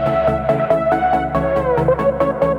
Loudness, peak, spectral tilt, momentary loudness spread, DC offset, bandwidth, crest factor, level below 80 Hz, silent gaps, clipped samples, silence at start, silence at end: -17 LUFS; -4 dBFS; -8.5 dB/octave; 2 LU; under 0.1%; 10.5 kHz; 12 dB; -34 dBFS; none; under 0.1%; 0 s; 0 s